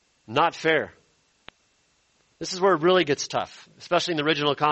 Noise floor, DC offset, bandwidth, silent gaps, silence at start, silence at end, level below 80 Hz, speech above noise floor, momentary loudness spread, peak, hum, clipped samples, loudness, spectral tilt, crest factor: -66 dBFS; under 0.1%; 8.4 kHz; none; 0.3 s; 0 s; -64 dBFS; 43 dB; 16 LU; -6 dBFS; none; under 0.1%; -23 LUFS; -4 dB/octave; 18 dB